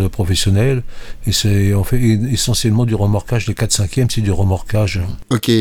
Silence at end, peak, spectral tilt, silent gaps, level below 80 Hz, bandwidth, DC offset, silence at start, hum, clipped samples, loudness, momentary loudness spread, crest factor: 0 s; 0 dBFS; -5 dB/octave; none; -28 dBFS; 17 kHz; under 0.1%; 0 s; none; under 0.1%; -16 LUFS; 5 LU; 14 dB